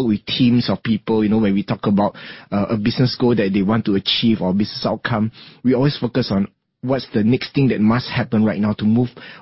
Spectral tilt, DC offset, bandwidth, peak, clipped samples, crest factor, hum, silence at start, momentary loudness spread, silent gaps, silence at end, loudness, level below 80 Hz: -10.5 dB/octave; under 0.1%; 5.8 kHz; -4 dBFS; under 0.1%; 14 dB; none; 0 s; 7 LU; none; 0.05 s; -18 LUFS; -48 dBFS